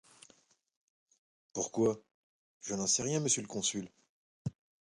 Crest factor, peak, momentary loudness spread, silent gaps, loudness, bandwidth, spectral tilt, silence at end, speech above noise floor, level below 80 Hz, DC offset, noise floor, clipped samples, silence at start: 20 dB; -16 dBFS; 14 LU; 2.14-2.61 s, 4.09-4.45 s; -34 LUFS; 11.5 kHz; -3.5 dB/octave; 0.35 s; 35 dB; -70 dBFS; under 0.1%; -68 dBFS; under 0.1%; 1.55 s